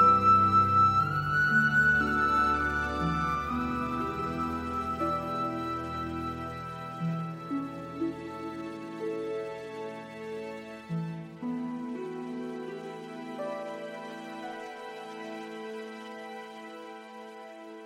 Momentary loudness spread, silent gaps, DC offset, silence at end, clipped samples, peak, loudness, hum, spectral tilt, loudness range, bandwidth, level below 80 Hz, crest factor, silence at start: 19 LU; none; under 0.1%; 0 s; under 0.1%; -12 dBFS; -29 LUFS; none; -6.5 dB/octave; 14 LU; 15.5 kHz; -52 dBFS; 18 dB; 0 s